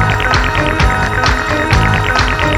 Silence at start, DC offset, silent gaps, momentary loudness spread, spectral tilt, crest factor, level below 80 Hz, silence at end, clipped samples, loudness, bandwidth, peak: 0 s; under 0.1%; none; 2 LU; -5 dB/octave; 12 dB; -20 dBFS; 0 s; under 0.1%; -12 LUFS; 17.5 kHz; 0 dBFS